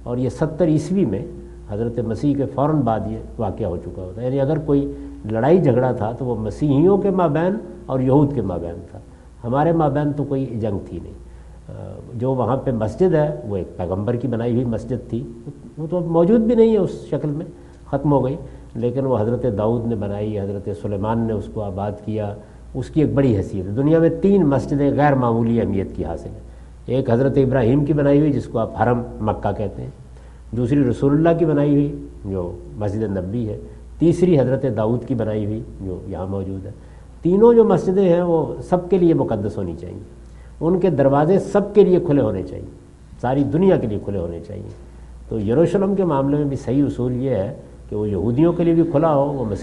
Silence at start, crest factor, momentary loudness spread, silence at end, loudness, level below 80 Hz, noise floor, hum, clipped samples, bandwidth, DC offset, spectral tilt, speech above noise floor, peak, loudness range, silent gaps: 0 s; 18 dB; 15 LU; 0 s; -19 LUFS; -40 dBFS; -39 dBFS; none; under 0.1%; 11 kHz; under 0.1%; -9.5 dB/octave; 21 dB; -2 dBFS; 5 LU; none